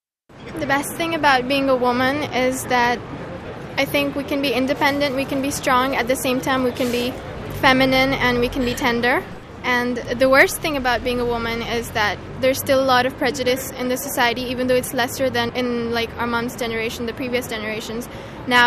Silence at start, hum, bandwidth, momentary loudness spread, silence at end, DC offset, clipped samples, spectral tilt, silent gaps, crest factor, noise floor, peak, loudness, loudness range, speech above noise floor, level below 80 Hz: 0.35 s; none; 14 kHz; 10 LU; 0 s; under 0.1%; under 0.1%; -4 dB/octave; none; 20 dB; -41 dBFS; 0 dBFS; -20 LUFS; 3 LU; 21 dB; -42 dBFS